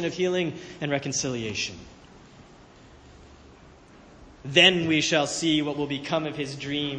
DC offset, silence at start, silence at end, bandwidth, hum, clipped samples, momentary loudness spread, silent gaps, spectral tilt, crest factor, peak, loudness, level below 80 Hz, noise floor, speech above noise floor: under 0.1%; 0 s; 0 s; 10 kHz; none; under 0.1%; 15 LU; none; -3.5 dB/octave; 24 dB; -4 dBFS; -24 LUFS; -56 dBFS; -51 dBFS; 25 dB